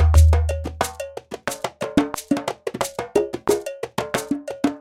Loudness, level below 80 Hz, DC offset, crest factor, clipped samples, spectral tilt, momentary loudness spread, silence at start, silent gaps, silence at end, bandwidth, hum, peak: -23 LUFS; -28 dBFS; under 0.1%; 20 dB; under 0.1%; -6 dB/octave; 11 LU; 0 s; none; 0 s; 15.5 kHz; none; -2 dBFS